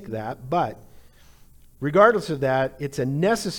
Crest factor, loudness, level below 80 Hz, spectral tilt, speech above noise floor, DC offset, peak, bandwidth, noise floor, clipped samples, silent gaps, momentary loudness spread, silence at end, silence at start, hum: 20 dB; -23 LUFS; -52 dBFS; -6 dB/octave; 28 dB; under 0.1%; -2 dBFS; 19 kHz; -50 dBFS; under 0.1%; none; 14 LU; 0 s; 0 s; none